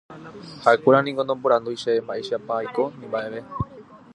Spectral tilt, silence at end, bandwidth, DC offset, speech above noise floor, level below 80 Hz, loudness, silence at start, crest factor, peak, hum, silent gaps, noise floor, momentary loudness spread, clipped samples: -6 dB/octave; 0.2 s; 11 kHz; under 0.1%; 23 dB; -52 dBFS; -23 LUFS; 0.1 s; 22 dB; -2 dBFS; none; none; -45 dBFS; 15 LU; under 0.1%